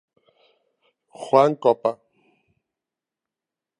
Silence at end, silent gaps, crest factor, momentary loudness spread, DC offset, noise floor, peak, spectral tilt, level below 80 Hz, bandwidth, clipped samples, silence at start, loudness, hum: 1.85 s; none; 24 dB; 22 LU; under 0.1%; -88 dBFS; -2 dBFS; -6.5 dB/octave; -80 dBFS; 10.5 kHz; under 0.1%; 1.2 s; -20 LUFS; none